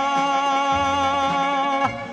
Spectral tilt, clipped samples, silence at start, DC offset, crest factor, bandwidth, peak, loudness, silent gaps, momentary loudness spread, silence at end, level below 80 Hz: -3.5 dB/octave; under 0.1%; 0 s; under 0.1%; 14 dB; 10.5 kHz; -6 dBFS; -20 LUFS; none; 1 LU; 0 s; -50 dBFS